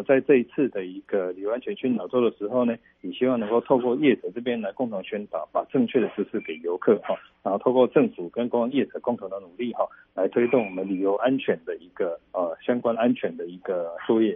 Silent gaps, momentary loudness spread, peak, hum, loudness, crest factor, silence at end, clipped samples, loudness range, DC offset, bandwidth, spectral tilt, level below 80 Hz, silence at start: none; 10 LU; -6 dBFS; none; -25 LUFS; 18 dB; 0 s; under 0.1%; 2 LU; under 0.1%; 3.8 kHz; -5 dB/octave; -70 dBFS; 0 s